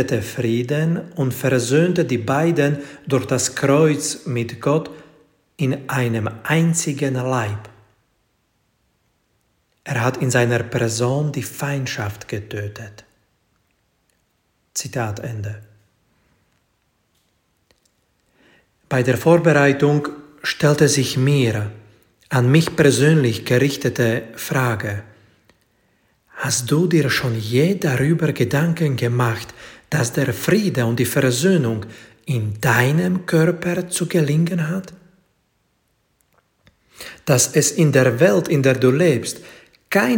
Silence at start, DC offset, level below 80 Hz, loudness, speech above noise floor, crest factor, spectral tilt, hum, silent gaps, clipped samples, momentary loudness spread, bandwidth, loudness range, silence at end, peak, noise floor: 0 s; under 0.1%; -56 dBFS; -19 LUFS; 48 dB; 20 dB; -5.5 dB/octave; none; none; under 0.1%; 13 LU; 17 kHz; 13 LU; 0 s; 0 dBFS; -67 dBFS